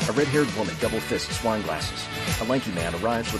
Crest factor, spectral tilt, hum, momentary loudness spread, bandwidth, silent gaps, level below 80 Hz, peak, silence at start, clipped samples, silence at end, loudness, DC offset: 16 dB; -4.5 dB/octave; none; 6 LU; 13.5 kHz; none; -44 dBFS; -10 dBFS; 0 s; under 0.1%; 0 s; -26 LUFS; under 0.1%